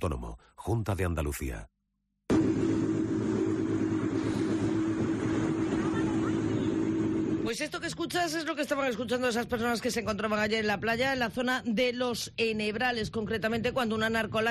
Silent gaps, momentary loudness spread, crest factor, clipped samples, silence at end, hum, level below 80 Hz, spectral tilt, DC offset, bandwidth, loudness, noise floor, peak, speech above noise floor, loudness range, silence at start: none; 5 LU; 12 dB; under 0.1%; 0 s; none; -48 dBFS; -5.5 dB/octave; under 0.1%; 13 kHz; -30 LUFS; -79 dBFS; -18 dBFS; 49 dB; 1 LU; 0 s